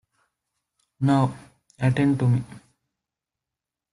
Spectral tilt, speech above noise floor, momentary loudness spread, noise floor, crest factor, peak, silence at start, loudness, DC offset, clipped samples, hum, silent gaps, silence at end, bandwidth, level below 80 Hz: -8 dB/octave; 67 dB; 6 LU; -88 dBFS; 18 dB; -8 dBFS; 1 s; -23 LUFS; under 0.1%; under 0.1%; none; none; 1.35 s; 11 kHz; -58 dBFS